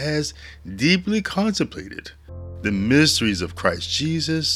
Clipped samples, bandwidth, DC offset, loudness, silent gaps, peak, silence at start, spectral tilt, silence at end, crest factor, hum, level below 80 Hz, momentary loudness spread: under 0.1%; 15 kHz; under 0.1%; -21 LUFS; none; -2 dBFS; 0 s; -4 dB/octave; 0 s; 20 dB; none; -46 dBFS; 20 LU